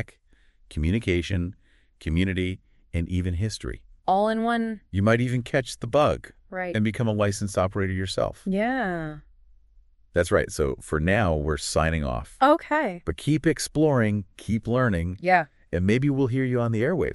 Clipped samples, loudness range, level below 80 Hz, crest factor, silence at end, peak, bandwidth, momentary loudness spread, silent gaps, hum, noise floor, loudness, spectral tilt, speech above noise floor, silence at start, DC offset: under 0.1%; 4 LU; -40 dBFS; 20 dB; 0 s; -6 dBFS; 12 kHz; 9 LU; none; none; -59 dBFS; -25 LUFS; -6 dB/octave; 35 dB; 0 s; under 0.1%